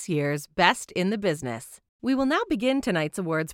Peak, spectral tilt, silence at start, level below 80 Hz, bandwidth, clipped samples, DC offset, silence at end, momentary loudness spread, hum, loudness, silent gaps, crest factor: -4 dBFS; -5 dB/octave; 0 s; -56 dBFS; 16.5 kHz; under 0.1%; under 0.1%; 0 s; 11 LU; none; -25 LUFS; 1.89-1.99 s; 22 dB